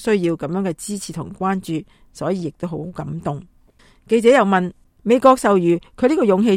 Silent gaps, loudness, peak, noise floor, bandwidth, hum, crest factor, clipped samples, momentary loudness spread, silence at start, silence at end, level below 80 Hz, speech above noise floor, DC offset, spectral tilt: none; -19 LUFS; 0 dBFS; -52 dBFS; 15.5 kHz; none; 18 dB; under 0.1%; 15 LU; 0 s; 0 s; -52 dBFS; 34 dB; under 0.1%; -6 dB/octave